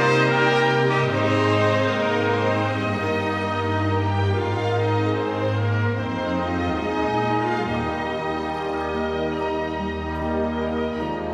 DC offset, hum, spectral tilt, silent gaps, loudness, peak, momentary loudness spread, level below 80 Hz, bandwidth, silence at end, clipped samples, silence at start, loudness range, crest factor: under 0.1%; none; -6.5 dB/octave; none; -22 LUFS; -8 dBFS; 7 LU; -44 dBFS; 10 kHz; 0 s; under 0.1%; 0 s; 5 LU; 14 dB